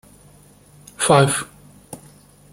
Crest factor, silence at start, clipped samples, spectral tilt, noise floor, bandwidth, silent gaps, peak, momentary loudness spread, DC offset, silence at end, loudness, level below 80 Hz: 22 dB; 1 s; under 0.1%; -4 dB/octave; -49 dBFS; 16 kHz; none; -2 dBFS; 25 LU; under 0.1%; 0.55 s; -17 LUFS; -56 dBFS